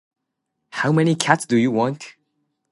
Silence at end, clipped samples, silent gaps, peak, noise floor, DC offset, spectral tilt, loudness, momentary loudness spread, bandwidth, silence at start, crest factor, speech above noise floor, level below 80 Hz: 0.6 s; under 0.1%; none; 0 dBFS; -78 dBFS; under 0.1%; -5.5 dB/octave; -19 LUFS; 17 LU; 11.5 kHz; 0.75 s; 20 dB; 59 dB; -66 dBFS